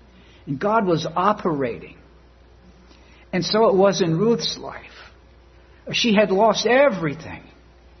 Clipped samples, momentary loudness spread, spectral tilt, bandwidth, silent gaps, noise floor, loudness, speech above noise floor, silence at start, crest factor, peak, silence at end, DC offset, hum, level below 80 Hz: under 0.1%; 18 LU; -5 dB/octave; 6.4 kHz; none; -50 dBFS; -20 LUFS; 30 dB; 0.45 s; 18 dB; -4 dBFS; 0.6 s; under 0.1%; none; -52 dBFS